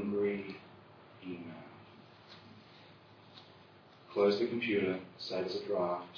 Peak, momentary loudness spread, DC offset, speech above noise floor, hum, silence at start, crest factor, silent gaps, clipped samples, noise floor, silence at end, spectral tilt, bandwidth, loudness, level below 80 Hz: -18 dBFS; 25 LU; under 0.1%; 25 dB; none; 0 s; 20 dB; none; under 0.1%; -59 dBFS; 0 s; -4 dB/octave; 5.4 kHz; -35 LUFS; -76 dBFS